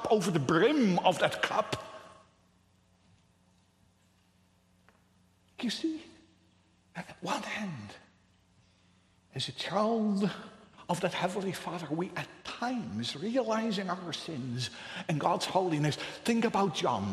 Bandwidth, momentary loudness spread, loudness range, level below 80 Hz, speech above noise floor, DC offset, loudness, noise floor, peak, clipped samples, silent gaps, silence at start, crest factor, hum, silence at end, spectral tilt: 13 kHz; 15 LU; 11 LU; -70 dBFS; 36 dB; under 0.1%; -32 LUFS; -67 dBFS; -10 dBFS; under 0.1%; none; 0 s; 24 dB; none; 0 s; -5 dB/octave